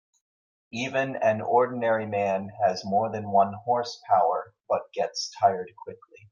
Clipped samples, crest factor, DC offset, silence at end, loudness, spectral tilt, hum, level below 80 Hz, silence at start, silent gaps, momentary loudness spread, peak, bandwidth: under 0.1%; 18 dB; under 0.1%; 0.35 s; -26 LUFS; -5 dB/octave; none; -76 dBFS; 0.75 s; none; 10 LU; -8 dBFS; 7.4 kHz